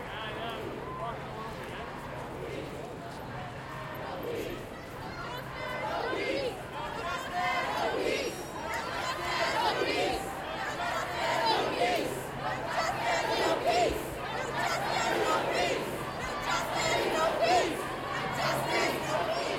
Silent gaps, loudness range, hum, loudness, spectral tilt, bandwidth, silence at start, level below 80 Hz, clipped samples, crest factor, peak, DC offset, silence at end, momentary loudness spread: none; 10 LU; none; -32 LUFS; -3.5 dB/octave; 16 kHz; 0 s; -54 dBFS; under 0.1%; 18 dB; -14 dBFS; under 0.1%; 0 s; 12 LU